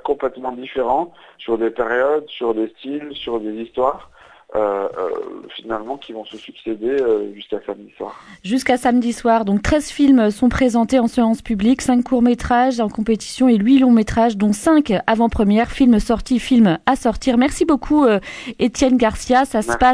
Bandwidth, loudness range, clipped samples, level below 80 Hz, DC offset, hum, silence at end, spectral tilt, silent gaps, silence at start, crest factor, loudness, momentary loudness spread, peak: 11 kHz; 9 LU; under 0.1%; -38 dBFS; under 0.1%; none; 0 s; -5.5 dB/octave; none; 0.05 s; 16 dB; -17 LUFS; 14 LU; 0 dBFS